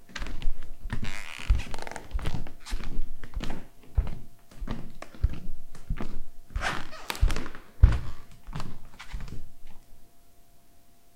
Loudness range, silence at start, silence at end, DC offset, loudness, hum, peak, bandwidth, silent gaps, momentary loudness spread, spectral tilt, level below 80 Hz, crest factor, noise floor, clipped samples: 7 LU; 0 s; 0.3 s; 0.5%; -34 LUFS; none; -4 dBFS; 10.5 kHz; none; 16 LU; -5.5 dB/octave; -30 dBFS; 22 dB; -58 dBFS; under 0.1%